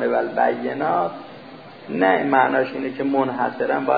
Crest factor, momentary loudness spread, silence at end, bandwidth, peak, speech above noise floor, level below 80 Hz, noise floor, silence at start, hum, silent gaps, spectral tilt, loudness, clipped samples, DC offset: 18 dB; 21 LU; 0 s; 5 kHz; -4 dBFS; 20 dB; -70 dBFS; -40 dBFS; 0 s; none; none; -9 dB/octave; -21 LUFS; under 0.1%; 0.1%